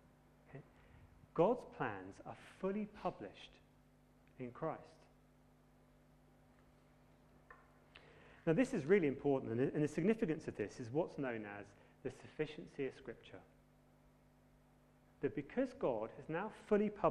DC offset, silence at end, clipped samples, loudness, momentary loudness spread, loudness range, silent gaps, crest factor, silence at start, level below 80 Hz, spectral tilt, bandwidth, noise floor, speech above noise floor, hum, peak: under 0.1%; 0 s; under 0.1%; -40 LUFS; 23 LU; 15 LU; none; 22 dB; 0.5 s; -70 dBFS; -7.5 dB/octave; 11 kHz; -69 dBFS; 29 dB; 50 Hz at -70 dBFS; -20 dBFS